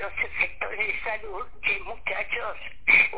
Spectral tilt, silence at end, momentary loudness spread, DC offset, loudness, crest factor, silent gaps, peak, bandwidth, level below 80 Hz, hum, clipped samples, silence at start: 0.5 dB/octave; 0 s; 11 LU; 2%; -26 LUFS; 20 dB; none; -6 dBFS; 4 kHz; -50 dBFS; none; under 0.1%; 0 s